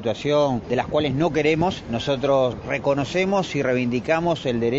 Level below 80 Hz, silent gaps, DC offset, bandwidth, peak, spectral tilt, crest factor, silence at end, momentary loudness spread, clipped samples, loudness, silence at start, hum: -48 dBFS; none; under 0.1%; 8 kHz; -8 dBFS; -6 dB/octave; 14 dB; 0 s; 4 LU; under 0.1%; -22 LUFS; 0 s; none